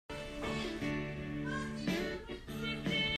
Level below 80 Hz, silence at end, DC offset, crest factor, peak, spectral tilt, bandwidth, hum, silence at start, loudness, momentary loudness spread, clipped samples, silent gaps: -52 dBFS; 0 s; under 0.1%; 16 dB; -22 dBFS; -5 dB/octave; 15 kHz; none; 0.1 s; -38 LUFS; 7 LU; under 0.1%; none